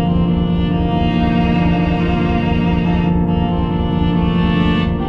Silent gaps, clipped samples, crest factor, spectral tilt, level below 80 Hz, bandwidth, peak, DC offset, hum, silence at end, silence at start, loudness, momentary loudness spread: none; under 0.1%; 10 dB; -9 dB/octave; -24 dBFS; 5.2 kHz; -4 dBFS; under 0.1%; none; 0 s; 0 s; -16 LUFS; 2 LU